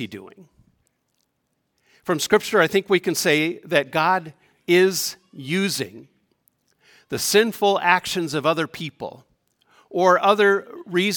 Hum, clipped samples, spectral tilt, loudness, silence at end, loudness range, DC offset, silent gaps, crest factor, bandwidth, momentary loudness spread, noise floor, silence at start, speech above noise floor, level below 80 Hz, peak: none; under 0.1%; -3.5 dB/octave; -20 LUFS; 0 s; 3 LU; under 0.1%; none; 20 dB; 18 kHz; 15 LU; -73 dBFS; 0 s; 53 dB; -66 dBFS; -2 dBFS